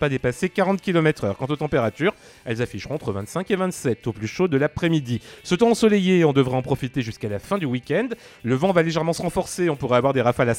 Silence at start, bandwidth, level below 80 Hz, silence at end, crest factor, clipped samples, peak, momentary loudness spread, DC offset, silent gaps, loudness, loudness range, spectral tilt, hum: 0 s; 16.5 kHz; -50 dBFS; 0 s; 18 dB; under 0.1%; -4 dBFS; 11 LU; under 0.1%; none; -22 LUFS; 4 LU; -6 dB/octave; none